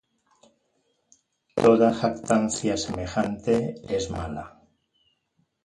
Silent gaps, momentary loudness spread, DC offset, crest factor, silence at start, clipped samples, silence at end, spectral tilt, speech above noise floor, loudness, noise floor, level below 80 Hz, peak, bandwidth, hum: none; 14 LU; under 0.1%; 22 dB; 1.55 s; under 0.1%; 1.15 s; -5.5 dB/octave; 48 dB; -24 LUFS; -72 dBFS; -50 dBFS; -6 dBFS; 11.5 kHz; none